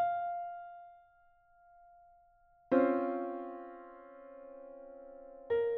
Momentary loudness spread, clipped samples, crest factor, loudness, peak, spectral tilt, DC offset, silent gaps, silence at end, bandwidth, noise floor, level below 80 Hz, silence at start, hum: 22 LU; under 0.1%; 22 dB; -35 LUFS; -16 dBFS; -5 dB/octave; under 0.1%; none; 0 s; 4.2 kHz; -66 dBFS; -74 dBFS; 0 s; none